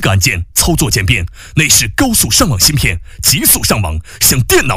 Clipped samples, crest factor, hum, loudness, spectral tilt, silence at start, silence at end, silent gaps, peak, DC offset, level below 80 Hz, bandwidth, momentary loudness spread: under 0.1%; 12 dB; none; -10 LUFS; -3 dB/octave; 0 s; 0 s; none; 0 dBFS; under 0.1%; -26 dBFS; 16.5 kHz; 7 LU